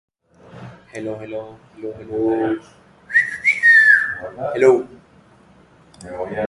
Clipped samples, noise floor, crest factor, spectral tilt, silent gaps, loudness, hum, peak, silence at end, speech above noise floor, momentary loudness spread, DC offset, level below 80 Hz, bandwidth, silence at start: under 0.1%; -50 dBFS; 18 dB; -5 dB/octave; none; -15 LUFS; none; -2 dBFS; 0 s; 29 dB; 23 LU; under 0.1%; -56 dBFS; 11.5 kHz; 0.55 s